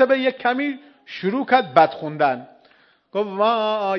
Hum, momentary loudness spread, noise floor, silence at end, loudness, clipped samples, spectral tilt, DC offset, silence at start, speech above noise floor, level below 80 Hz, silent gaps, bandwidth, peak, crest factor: none; 12 LU; -56 dBFS; 0 s; -20 LUFS; under 0.1%; -7 dB/octave; under 0.1%; 0 s; 36 dB; -74 dBFS; none; 6.4 kHz; 0 dBFS; 20 dB